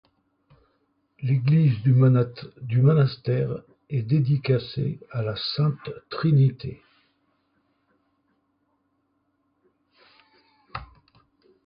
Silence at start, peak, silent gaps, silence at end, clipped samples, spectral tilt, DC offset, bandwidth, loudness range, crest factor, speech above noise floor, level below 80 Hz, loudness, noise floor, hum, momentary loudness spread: 1.2 s; -8 dBFS; none; 0.8 s; under 0.1%; -12 dB/octave; under 0.1%; 5.4 kHz; 7 LU; 16 dB; 50 dB; -58 dBFS; -23 LUFS; -72 dBFS; none; 18 LU